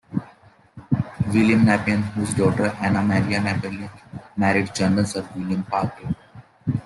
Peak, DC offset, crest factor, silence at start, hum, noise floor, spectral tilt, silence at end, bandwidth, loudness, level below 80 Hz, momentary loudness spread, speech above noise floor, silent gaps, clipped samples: -4 dBFS; under 0.1%; 18 dB; 0.1 s; none; -52 dBFS; -6.5 dB/octave; 0 s; 12 kHz; -22 LUFS; -52 dBFS; 14 LU; 31 dB; none; under 0.1%